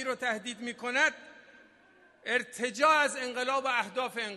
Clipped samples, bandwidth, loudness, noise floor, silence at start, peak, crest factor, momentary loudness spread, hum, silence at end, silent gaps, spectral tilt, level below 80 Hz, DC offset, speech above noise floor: under 0.1%; 13.5 kHz; -29 LUFS; -61 dBFS; 0 s; -12 dBFS; 20 dB; 12 LU; none; 0 s; none; -1.5 dB/octave; -82 dBFS; under 0.1%; 31 dB